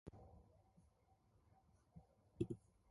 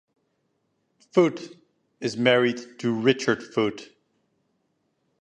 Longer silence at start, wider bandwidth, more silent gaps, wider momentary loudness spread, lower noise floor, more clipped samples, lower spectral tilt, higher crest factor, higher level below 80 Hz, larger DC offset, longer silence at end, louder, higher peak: second, 0.05 s vs 1.15 s; first, 11 kHz vs 9.6 kHz; neither; first, 20 LU vs 14 LU; about the same, -76 dBFS vs -73 dBFS; neither; first, -9 dB/octave vs -5.5 dB/octave; about the same, 26 dB vs 22 dB; about the same, -72 dBFS vs -70 dBFS; neither; second, 0.3 s vs 1.4 s; second, -51 LUFS vs -24 LUFS; second, -30 dBFS vs -4 dBFS